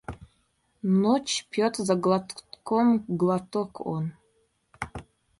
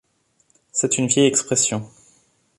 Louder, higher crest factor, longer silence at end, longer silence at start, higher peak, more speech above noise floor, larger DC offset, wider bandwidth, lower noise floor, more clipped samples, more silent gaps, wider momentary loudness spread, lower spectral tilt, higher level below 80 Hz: second, -26 LUFS vs -19 LUFS; about the same, 18 dB vs 20 dB; second, 0.4 s vs 0.7 s; second, 0.1 s vs 0.75 s; second, -10 dBFS vs -2 dBFS; about the same, 45 dB vs 45 dB; neither; about the same, 11.5 kHz vs 11.5 kHz; first, -70 dBFS vs -64 dBFS; neither; neither; first, 17 LU vs 9 LU; first, -5.5 dB/octave vs -3 dB/octave; about the same, -58 dBFS vs -62 dBFS